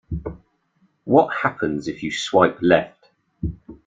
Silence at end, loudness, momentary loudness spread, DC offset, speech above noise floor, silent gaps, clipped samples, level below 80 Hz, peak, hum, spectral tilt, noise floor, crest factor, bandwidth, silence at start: 0.1 s; -21 LUFS; 15 LU; under 0.1%; 45 dB; none; under 0.1%; -44 dBFS; -2 dBFS; none; -5.5 dB/octave; -64 dBFS; 20 dB; 9.4 kHz; 0.1 s